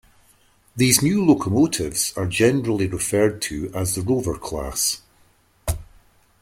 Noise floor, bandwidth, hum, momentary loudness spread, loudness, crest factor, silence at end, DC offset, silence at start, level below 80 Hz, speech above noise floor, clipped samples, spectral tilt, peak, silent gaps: -58 dBFS; 16.5 kHz; none; 13 LU; -21 LUFS; 20 dB; 0.55 s; under 0.1%; 0.75 s; -42 dBFS; 38 dB; under 0.1%; -4.5 dB/octave; -2 dBFS; none